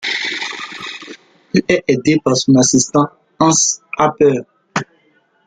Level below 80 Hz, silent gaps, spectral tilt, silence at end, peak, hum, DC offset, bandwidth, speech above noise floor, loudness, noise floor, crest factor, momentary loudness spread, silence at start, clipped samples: -52 dBFS; none; -3.5 dB/octave; 0.65 s; -2 dBFS; none; under 0.1%; 10 kHz; 44 dB; -15 LUFS; -57 dBFS; 14 dB; 15 LU; 0 s; under 0.1%